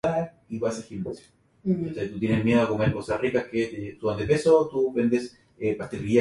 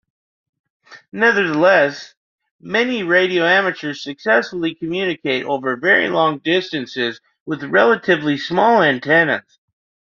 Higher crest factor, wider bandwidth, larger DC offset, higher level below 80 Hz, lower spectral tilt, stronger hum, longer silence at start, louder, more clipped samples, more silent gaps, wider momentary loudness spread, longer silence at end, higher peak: about the same, 18 dB vs 16 dB; first, 11.5 kHz vs 7.2 kHz; neither; first, -52 dBFS vs -64 dBFS; first, -7 dB/octave vs -2.5 dB/octave; neither; second, 0.05 s vs 0.9 s; second, -26 LUFS vs -17 LUFS; neither; second, none vs 2.17-2.38 s, 2.51-2.59 s, 7.40-7.46 s; about the same, 13 LU vs 11 LU; second, 0 s vs 0.7 s; second, -8 dBFS vs -2 dBFS